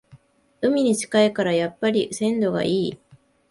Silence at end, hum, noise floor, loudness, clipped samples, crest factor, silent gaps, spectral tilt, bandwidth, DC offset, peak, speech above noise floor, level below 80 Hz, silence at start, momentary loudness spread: 0.55 s; none; -53 dBFS; -22 LUFS; under 0.1%; 18 dB; none; -5 dB/octave; 11.5 kHz; under 0.1%; -4 dBFS; 32 dB; -62 dBFS; 0.15 s; 5 LU